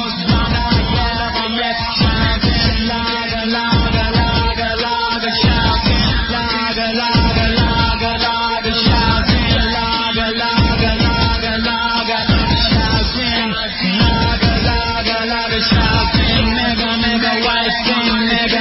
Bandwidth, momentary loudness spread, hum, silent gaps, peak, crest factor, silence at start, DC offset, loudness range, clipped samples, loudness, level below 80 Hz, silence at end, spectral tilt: 5.8 kHz; 4 LU; none; none; 0 dBFS; 14 dB; 0 s; under 0.1%; 1 LU; under 0.1%; -15 LUFS; -22 dBFS; 0 s; -8.5 dB/octave